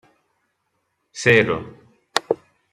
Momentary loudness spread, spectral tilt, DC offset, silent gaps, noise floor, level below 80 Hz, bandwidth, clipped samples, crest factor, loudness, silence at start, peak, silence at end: 19 LU; -4.5 dB/octave; under 0.1%; none; -72 dBFS; -58 dBFS; 13.5 kHz; under 0.1%; 22 dB; -20 LUFS; 1.15 s; -2 dBFS; 0.4 s